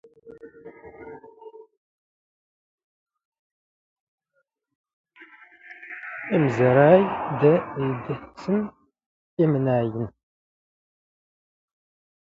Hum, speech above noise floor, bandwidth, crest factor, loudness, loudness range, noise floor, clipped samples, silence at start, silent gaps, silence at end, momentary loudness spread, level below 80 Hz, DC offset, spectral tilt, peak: none; 54 dB; 7.6 kHz; 22 dB; -22 LUFS; 7 LU; -74 dBFS; under 0.1%; 0.25 s; 1.77-2.78 s, 2.84-3.06 s, 3.25-3.32 s, 3.39-4.18 s, 4.75-4.84 s, 4.93-5.04 s, 9.06-9.37 s; 2.25 s; 26 LU; -62 dBFS; under 0.1%; -9 dB/octave; -4 dBFS